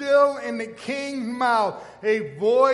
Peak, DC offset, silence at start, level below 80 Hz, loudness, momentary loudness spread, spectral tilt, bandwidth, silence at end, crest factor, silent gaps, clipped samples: -6 dBFS; under 0.1%; 0 s; -68 dBFS; -23 LUFS; 11 LU; -4.5 dB/octave; 11.5 kHz; 0 s; 16 dB; none; under 0.1%